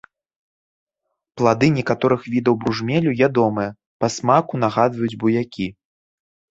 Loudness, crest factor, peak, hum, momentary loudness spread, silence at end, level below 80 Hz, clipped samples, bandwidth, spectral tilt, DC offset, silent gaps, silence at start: -20 LUFS; 18 dB; -2 dBFS; none; 8 LU; 0.85 s; -56 dBFS; under 0.1%; 7.8 kHz; -6.5 dB/octave; under 0.1%; 3.86-4.00 s; 1.35 s